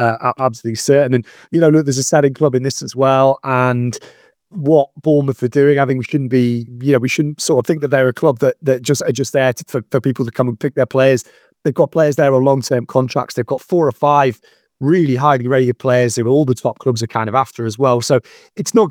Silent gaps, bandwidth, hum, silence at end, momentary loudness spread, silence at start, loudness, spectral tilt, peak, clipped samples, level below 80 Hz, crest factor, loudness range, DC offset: none; 18.5 kHz; none; 0 s; 7 LU; 0 s; -15 LUFS; -6 dB/octave; 0 dBFS; under 0.1%; -62 dBFS; 14 dB; 2 LU; under 0.1%